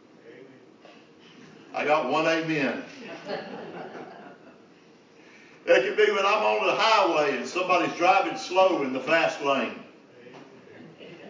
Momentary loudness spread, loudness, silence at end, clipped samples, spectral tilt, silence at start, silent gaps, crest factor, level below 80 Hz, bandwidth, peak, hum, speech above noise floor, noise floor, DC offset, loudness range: 19 LU; -24 LUFS; 0 s; under 0.1%; -4 dB/octave; 0.25 s; none; 20 dB; -84 dBFS; 7.6 kHz; -8 dBFS; none; 31 dB; -54 dBFS; under 0.1%; 8 LU